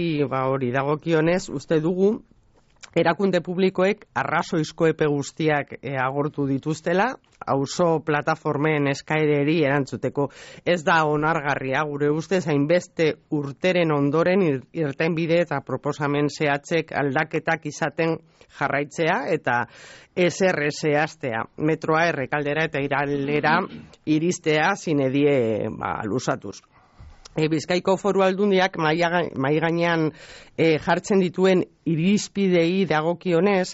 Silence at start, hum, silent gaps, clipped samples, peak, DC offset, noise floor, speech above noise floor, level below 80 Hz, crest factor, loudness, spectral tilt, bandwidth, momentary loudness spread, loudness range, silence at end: 0 s; none; none; under 0.1%; -8 dBFS; under 0.1%; -47 dBFS; 25 dB; -58 dBFS; 14 dB; -23 LUFS; -5 dB/octave; 8 kHz; 6 LU; 3 LU; 0 s